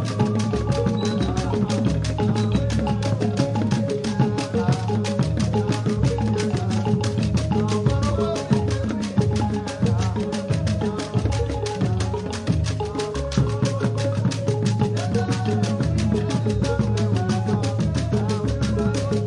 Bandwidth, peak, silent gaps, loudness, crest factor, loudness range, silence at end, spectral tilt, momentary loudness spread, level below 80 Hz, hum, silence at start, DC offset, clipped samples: 11 kHz; -6 dBFS; none; -23 LUFS; 16 dB; 2 LU; 0 s; -7 dB/octave; 3 LU; -36 dBFS; none; 0 s; under 0.1%; under 0.1%